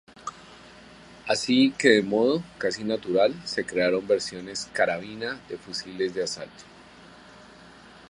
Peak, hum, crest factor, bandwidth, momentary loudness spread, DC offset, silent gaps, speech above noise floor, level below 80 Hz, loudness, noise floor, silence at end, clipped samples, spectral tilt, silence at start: -4 dBFS; none; 22 dB; 11.5 kHz; 16 LU; under 0.1%; none; 24 dB; -62 dBFS; -25 LUFS; -49 dBFS; 0.4 s; under 0.1%; -4 dB/octave; 0.25 s